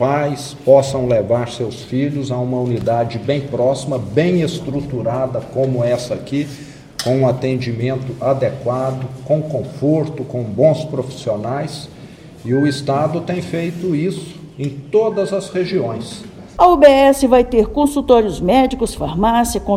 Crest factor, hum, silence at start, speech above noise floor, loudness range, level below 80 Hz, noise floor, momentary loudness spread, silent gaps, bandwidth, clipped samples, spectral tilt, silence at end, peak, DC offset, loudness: 16 dB; none; 0 s; 21 dB; 7 LU; -38 dBFS; -37 dBFS; 11 LU; none; 15.5 kHz; 0.1%; -6.5 dB/octave; 0 s; 0 dBFS; under 0.1%; -17 LUFS